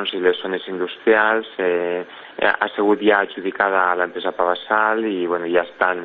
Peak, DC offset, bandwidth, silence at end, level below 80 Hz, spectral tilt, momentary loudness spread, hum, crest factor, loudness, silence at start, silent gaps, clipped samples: -2 dBFS; under 0.1%; 4.6 kHz; 0 s; -62 dBFS; -7.5 dB/octave; 8 LU; none; 18 dB; -19 LUFS; 0 s; none; under 0.1%